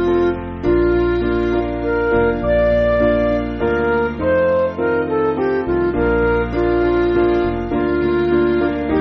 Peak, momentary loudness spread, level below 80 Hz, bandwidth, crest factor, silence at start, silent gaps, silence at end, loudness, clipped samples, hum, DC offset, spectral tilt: -4 dBFS; 4 LU; -30 dBFS; 5.8 kHz; 14 dB; 0 s; none; 0 s; -17 LUFS; under 0.1%; none; under 0.1%; -6.5 dB/octave